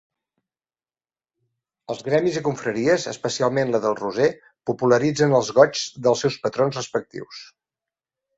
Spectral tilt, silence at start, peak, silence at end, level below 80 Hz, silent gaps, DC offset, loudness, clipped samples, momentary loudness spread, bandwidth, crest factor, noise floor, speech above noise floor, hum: -5 dB/octave; 1.9 s; -2 dBFS; 0.95 s; -64 dBFS; none; under 0.1%; -21 LUFS; under 0.1%; 14 LU; 8 kHz; 22 dB; under -90 dBFS; over 69 dB; none